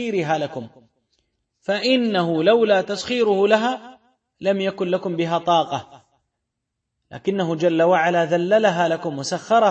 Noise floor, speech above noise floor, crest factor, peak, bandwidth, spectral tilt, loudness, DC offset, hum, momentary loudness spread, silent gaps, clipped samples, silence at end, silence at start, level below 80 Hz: -79 dBFS; 60 dB; 18 dB; -4 dBFS; 8.6 kHz; -5.5 dB/octave; -20 LUFS; under 0.1%; none; 10 LU; none; under 0.1%; 0 s; 0 s; -66 dBFS